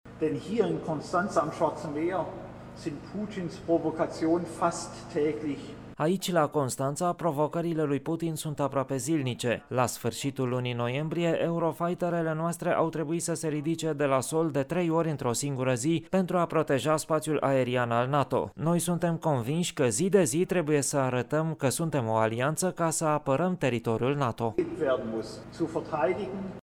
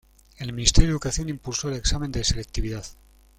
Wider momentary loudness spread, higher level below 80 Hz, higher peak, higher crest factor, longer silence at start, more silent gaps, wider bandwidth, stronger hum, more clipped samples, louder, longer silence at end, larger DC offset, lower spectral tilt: second, 6 LU vs 15 LU; second, -60 dBFS vs -28 dBFS; second, -10 dBFS vs 0 dBFS; second, 18 dB vs 24 dB; second, 0.05 s vs 0.4 s; neither; first, 18 kHz vs 14 kHz; neither; neither; second, -29 LUFS vs -25 LUFS; second, 0.05 s vs 0.45 s; neither; first, -5.5 dB/octave vs -3.5 dB/octave